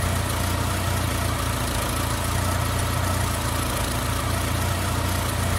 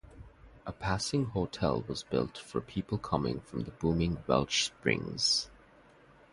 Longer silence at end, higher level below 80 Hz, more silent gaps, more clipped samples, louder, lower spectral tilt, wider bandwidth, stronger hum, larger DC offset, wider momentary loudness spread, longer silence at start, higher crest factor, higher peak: second, 0 s vs 0.8 s; first, -32 dBFS vs -50 dBFS; neither; neither; first, -24 LUFS vs -32 LUFS; about the same, -4 dB/octave vs -4.5 dB/octave; first, 16.5 kHz vs 11.5 kHz; neither; neither; second, 1 LU vs 11 LU; about the same, 0 s vs 0.05 s; second, 12 dB vs 24 dB; about the same, -12 dBFS vs -10 dBFS